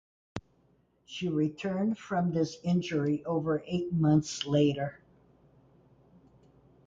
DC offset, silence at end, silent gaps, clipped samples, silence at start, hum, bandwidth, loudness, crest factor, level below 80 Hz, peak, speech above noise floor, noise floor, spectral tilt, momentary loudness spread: under 0.1%; 1.9 s; none; under 0.1%; 0.35 s; none; 7.8 kHz; -30 LUFS; 18 dB; -62 dBFS; -14 dBFS; 39 dB; -68 dBFS; -6.5 dB/octave; 15 LU